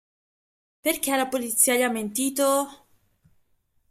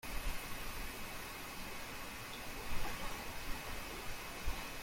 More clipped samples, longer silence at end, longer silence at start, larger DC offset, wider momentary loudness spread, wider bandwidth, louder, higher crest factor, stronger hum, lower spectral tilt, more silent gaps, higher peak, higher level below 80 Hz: neither; first, 1.15 s vs 0 s; first, 0.85 s vs 0.05 s; neither; first, 8 LU vs 2 LU; about the same, 16 kHz vs 16.5 kHz; first, -23 LUFS vs -45 LUFS; about the same, 18 dB vs 16 dB; neither; second, -1.5 dB/octave vs -3 dB/octave; neither; first, -8 dBFS vs -24 dBFS; second, -68 dBFS vs -48 dBFS